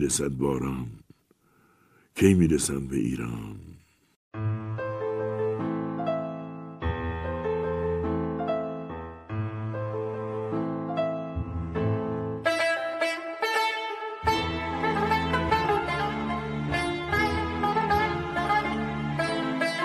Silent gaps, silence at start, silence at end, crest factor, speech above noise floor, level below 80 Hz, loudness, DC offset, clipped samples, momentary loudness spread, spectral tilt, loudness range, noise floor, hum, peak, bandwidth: 4.16-4.31 s; 0 s; 0 s; 22 dB; 39 dB; -46 dBFS; -28 LUFS; under 0.1%; under 0.1%; 9 LU; -5 dB/octave; 5 LU; -64 dBFS; none; -6 dBFS; 15.5 kHz